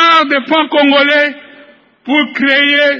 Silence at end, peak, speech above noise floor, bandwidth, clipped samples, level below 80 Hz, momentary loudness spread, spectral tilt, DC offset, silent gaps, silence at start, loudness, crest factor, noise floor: 0 s; 0 dBFS; 31 dB; 7.6 kHz; under 0.1%; -66 dBFS; 6 LU; -3.5 dB/octave; under 0.1%; none; 0 s; -10 LUFS; 12 dB; -42 dBFS